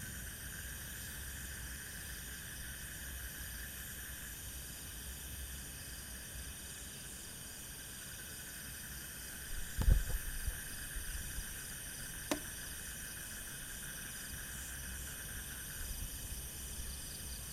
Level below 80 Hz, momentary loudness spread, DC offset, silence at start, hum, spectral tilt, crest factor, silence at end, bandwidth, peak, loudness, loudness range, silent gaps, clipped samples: -46 dBFS; 5 LU; under 0.1%; 0 s; none; -2.5 dB/octave; 26 dB; 0 s; 16 kHz; -16 dBFS; -43 LUFS; 5 LU; none; under 0.1%